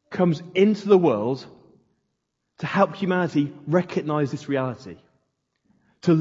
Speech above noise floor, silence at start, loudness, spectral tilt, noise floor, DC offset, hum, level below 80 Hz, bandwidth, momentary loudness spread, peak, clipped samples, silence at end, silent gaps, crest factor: 55 dB; 0.1 s; -23 LUFS; -7.5 dB/octave; -77 dBFS; under 0.1%; none; -68 dBFS; 7.6 kHz; 12 LU; -4 dBFS; under 0.1%; 0 s; none; 20 dB